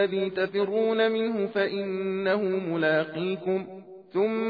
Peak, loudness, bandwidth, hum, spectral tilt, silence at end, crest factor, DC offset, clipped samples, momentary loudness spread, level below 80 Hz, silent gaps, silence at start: -10 dBFS; -27 LUFS; 5 kHz; none; -8.5 dB/octave; 0 s; 16 dB; under 0.1%; under 0.1%; 6 LU; -74 dBFS; none; 0 s